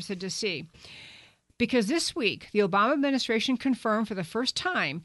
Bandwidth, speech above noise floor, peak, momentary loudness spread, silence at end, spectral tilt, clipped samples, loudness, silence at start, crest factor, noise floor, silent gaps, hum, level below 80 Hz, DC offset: 11.5 kHz; 27 dB; -10 dBFS; 12 LU; 0 s; -4 dB/octave; under 0.1%; -27 LUFS; 0 s; 18 dB; -55 dBFS; none; none; -64 dBFS; under 0.1%